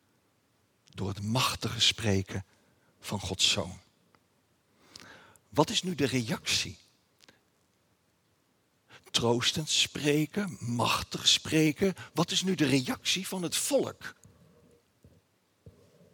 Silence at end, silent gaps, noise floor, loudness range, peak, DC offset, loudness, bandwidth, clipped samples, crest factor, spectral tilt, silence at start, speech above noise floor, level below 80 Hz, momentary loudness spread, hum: 0.45 s; none; -71 dBFS; 7 LU; -8 dBFS; under 0.1%; -28 LUFS; over 20 kHz; under 0.1%; 24 dB; -3.5 dB/octave; 0.95 s; 42 dB; -64 dBFS; 14 LU; none